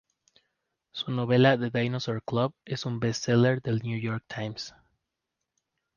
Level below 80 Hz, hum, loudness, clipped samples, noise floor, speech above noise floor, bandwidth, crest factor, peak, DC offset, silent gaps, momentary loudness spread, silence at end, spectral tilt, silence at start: -64 dBFS; none; -27 LUFS; under 0.1%; -85 dBFS; 58 dB; 7.2 kHz; 20 dB; -10 dBFS; under 0.1%; none; 14 LU; 1.3 s; -6 dB/octave; 0.95 s